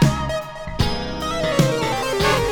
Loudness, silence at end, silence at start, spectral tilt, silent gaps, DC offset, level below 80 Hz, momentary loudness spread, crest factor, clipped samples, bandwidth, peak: -21 LUFS; 0 s; 0 s; -5 dB/octave; none; under 0.1%; -34 dBFS; 7 LU; 18 dB; under 0.1%; 19 kHz; -2 dBFS